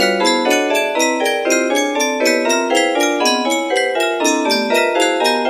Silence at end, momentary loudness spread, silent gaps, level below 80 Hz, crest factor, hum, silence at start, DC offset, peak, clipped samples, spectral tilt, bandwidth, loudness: 0 s; 2 LU; none; -66 dBFS; 16 dB; none; 0 s; under 0.1%; 0 dBFS; under 0.1%; -1.5 dB/octave; 15.5 kHz; -15 LUFS